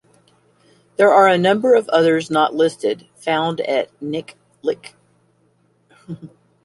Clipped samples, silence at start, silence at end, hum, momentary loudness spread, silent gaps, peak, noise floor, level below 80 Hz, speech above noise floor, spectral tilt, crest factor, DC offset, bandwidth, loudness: under 0.1%; 1 s; 0.35 s; none; 19 LU; none; -2 dBFS; -60 dBFS; -66 dBFS; 43 dB; -5.5 dB/octave; 18 dB; under 0.1%; 11.5 kHz; -17 LUFS